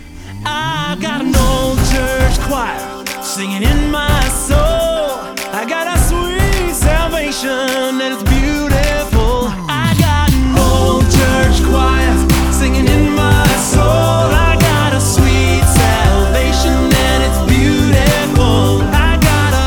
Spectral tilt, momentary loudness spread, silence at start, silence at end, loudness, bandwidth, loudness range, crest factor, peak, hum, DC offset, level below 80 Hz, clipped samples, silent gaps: -5 dB/octave; 7 LU; 0 s; 0 s; -13 LUFS; over 20 kHz; 4 LU; 12 dB; 0 dBFS; none; under 0.1%; -16 dBFS; under 0.1%; none